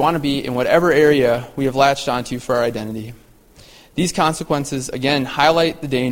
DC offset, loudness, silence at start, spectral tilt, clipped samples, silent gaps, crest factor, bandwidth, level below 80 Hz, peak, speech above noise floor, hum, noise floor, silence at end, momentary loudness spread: under 0.1%; -18 LUFS; 0 s; -5 dB/octave; under 0.1%; none; 18 dB; 16.5 kHz; -46 dBFS; 0 dBFS; 29 dB; none; -46 dBFS; 0 s; 10 LU